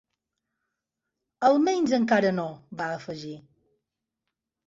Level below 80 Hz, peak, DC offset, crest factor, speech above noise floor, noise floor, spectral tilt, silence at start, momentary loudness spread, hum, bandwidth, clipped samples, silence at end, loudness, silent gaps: -70 dBFS; -8 dBFS; under 0.1%; 20 dB; 60 dB; -85 dBFS; -5.5 dB/octave; 1.4 s; 16 LU; none; 7.8 kHz; under 0.1%; 1.3 s; -25 LUFS; none